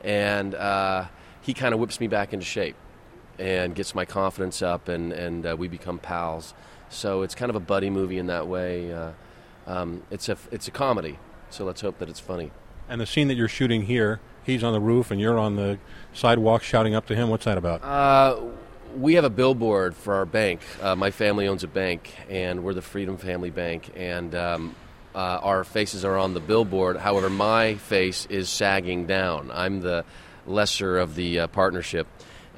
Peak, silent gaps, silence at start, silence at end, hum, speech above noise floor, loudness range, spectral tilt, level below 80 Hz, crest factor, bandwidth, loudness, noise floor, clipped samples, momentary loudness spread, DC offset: -4 dBFS; none; 0 s; 0 s; none; 24 dB; 8 LU; -5.5 dB/octave; -48 dBFS; 20 dB; 16 kHz; -25 LUFS; -48 dBFS; under 0.1%; 13 LU; under 0.1%